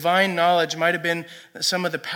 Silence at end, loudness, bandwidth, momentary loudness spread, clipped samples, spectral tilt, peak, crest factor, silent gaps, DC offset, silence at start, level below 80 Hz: 0 s; -21 LUFS; 17.5 kHz; 8 LU; under 0.1%; -3 dB/octave; -6 dBFS; 16 dB; none; under 0.1%; 0 s; -80 dBFS